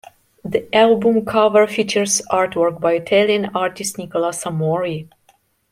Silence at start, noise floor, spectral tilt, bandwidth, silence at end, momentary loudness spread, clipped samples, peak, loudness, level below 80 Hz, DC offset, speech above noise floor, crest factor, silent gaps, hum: 0.45 s; -58 dBFS; -4 dB/octave; 16 kHz; 0.7 s; 10 LU; under 0.1%; -2 dBFS; -17 LUFS; -58 dBFS; under 0.1%; 41 dB; 16 dB; none; none